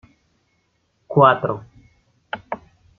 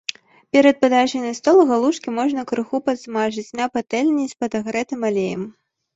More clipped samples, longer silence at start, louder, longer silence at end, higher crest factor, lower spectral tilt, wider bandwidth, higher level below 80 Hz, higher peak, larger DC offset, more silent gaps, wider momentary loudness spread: neither; first, 1.1 s vs 0.1 s; about the same, -18 LUFS vs -19 LUFS; about the same, 0.4 s vs 0.45 s; about the same, 22 dB vs 18 dB; first, -9 dB/octave vs -4.5 dB/octave; second, 4.6 kHz vs 8 kHz; about the same, -60 dBFS vs -62 dBFS; about the same, -2 dBFS vs -2 dBFS; neither; neither; first, 19 LU vs 10 LU